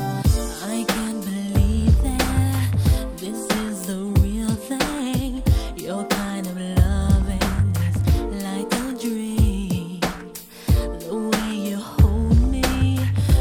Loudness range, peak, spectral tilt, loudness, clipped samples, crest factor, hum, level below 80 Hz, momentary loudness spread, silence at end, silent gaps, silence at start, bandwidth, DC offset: 3 LU; -4 dBFS; -6 dB/octave; -22 LUFS; under 0.1%; 16 dB; none; -24 dBFS; 8 LU; 0 s; none; 0 s; over 20 kHz; under 0.1%